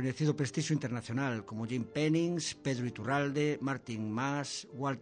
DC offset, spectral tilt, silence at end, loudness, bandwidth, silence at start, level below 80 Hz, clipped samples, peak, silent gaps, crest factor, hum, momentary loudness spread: under 0.1%; -5.5 dB/octave; 0 s; -34 LUFS; 10 kHz; 0 s; -72 dBFS; under 0.1%; -20 dBFS; none; 14 dB; none; 6 LU